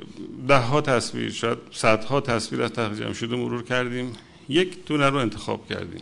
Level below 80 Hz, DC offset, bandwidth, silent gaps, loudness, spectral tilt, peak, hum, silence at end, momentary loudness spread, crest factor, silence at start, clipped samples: -52 dBFS; under 0.1%; 11 kHz; none; -24 LUFS; -5 dB/octave; -4 dBFS; none; 0 s; 11 LU; 20 dB; 0 s; under 0.1%